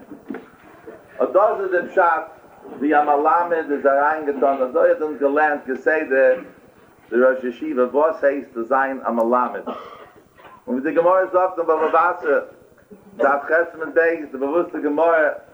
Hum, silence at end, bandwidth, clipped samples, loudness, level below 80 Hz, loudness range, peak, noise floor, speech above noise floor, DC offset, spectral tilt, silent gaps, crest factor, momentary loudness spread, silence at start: none; 0.15 s; over 20 kHz; under 0.1%; -19 LUFS; -68 dBFS; 3 LU; -4 dBFS; -49 dBFS; 31 dB; under 0.1%; -6.5 dB/octave; none; 16 dB; 10 LU; 0 s